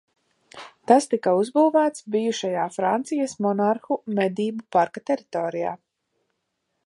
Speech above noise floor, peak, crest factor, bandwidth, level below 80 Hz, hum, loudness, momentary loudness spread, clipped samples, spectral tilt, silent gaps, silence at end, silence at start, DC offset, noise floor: 54 dB; -2 dBFS; 22 dB; 11.5 kHz; -76 dBFS; none; -23 LUFS; 10 LU; under 0.1%; -5.5 dB/octave; none; 1.1 s; 0.55 s; under 0.1%; -77 dBFS